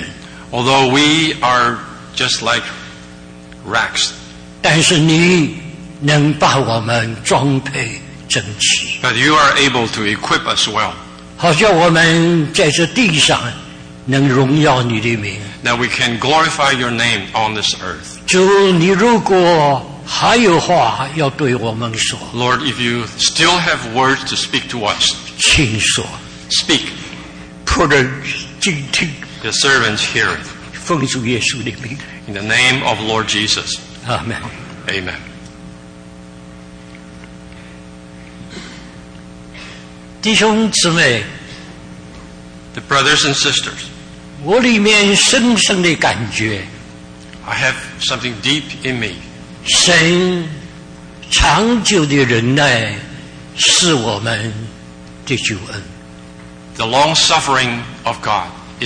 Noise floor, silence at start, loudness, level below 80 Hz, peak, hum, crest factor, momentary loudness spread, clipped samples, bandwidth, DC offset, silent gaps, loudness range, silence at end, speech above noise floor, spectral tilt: -35 dBFS; 0 s; -13 LUFS; -38 dBFS; 0 dBFS; none; 14 dB; 20 LU; under 0.1%; 10.5 kHz; under 0.1%; none; 6 LU; 0 s; 22 dB; -3.5 dB/octave